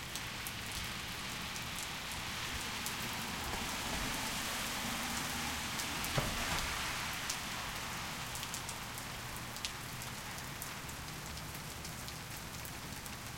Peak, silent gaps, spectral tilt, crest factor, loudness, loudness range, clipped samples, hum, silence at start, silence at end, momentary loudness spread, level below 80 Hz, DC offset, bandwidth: -16 dBFS; none; -2 dB/octave; 26 dB; -39 LUFS; 6 LU; under 0.1%; none; 0 s; 0 s; 8 LU; -54 dBFS; under 0.1%; 17 kHz